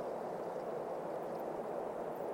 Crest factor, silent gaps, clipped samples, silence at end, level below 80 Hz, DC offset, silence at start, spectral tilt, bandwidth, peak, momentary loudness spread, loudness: 12 dB; none; under 0.1%; 0 s; -74 dBFS; under 0.1%; 0 s; -6.5 dB/octave; 16.5 kHz; -30 dBFS; 1 LU; -42 LUFS